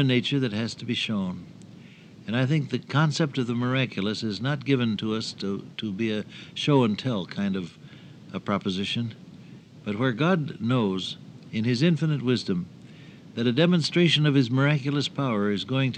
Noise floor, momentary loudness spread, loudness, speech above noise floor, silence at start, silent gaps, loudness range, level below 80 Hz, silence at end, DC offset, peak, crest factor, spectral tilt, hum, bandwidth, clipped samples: -47 dBFS; 13 LU; -26 LUFS; 22 dB; 0 s; none; 4 LU; -70 dBFS; 0 s; under 0.1%; -8 dBFS; 18 dB; -6.5 dB/octave; none; 9.4 kHz; under 0.1%